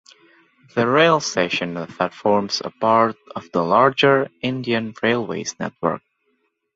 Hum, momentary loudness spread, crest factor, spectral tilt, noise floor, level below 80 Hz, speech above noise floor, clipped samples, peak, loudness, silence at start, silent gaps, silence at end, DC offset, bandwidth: none; 11 LU; 20 dB; -4.5 dB/octave; -69 dBFS; -62 dBFS; 49 dB; under 0.1%; -2 dBFS; -20 LUFS; 0.75 s; none; 0.75 s; under 0.1%; 8 kHz